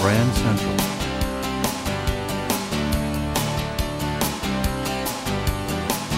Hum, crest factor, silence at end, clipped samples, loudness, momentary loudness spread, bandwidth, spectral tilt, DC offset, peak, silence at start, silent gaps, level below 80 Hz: none; 18 dB; 0 s; under 0.1%; -24 LUFS; 4 LU; 16.5 kHz; -4.5 dB/octave; under 0.1%; -6 dBFS; 0 s; none; -32 dBFS